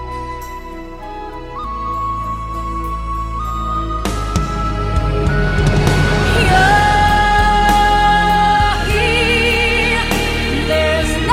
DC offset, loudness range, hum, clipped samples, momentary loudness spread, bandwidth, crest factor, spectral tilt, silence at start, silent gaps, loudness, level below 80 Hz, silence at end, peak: under 0.1%; 11 LU; none; under 0.1%; 15 LU; 16 kHz; 14 dB; -5 dB/octave; 0 s; none; -15 LUFS; -22 dBFS; 0 s; 0 dBFS